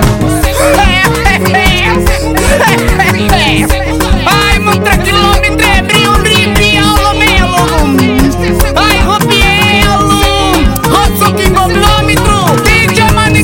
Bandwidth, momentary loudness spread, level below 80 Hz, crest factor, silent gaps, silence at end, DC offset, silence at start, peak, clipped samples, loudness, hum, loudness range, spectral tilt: 17.5 kHz; 3 LU; -14 dBFS; 8 dB; none; 0 s; 0.5%; 0 s; 0 dBFS; 0.5%; -7 LUFS; none; 1 LU; -4.5 dB/octave